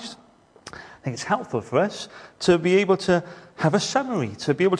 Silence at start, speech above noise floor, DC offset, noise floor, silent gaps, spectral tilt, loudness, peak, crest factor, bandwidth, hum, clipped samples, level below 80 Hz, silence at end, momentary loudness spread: 0 s; 32 dB; under 0.1%; -54 dBFS; none; -5.5 dB/octave; -23 LUFS; -6 dBFS; 18 dB; 10.5 kHz; none; under 0.1%; -58 dBFS; 0 s; 19 LU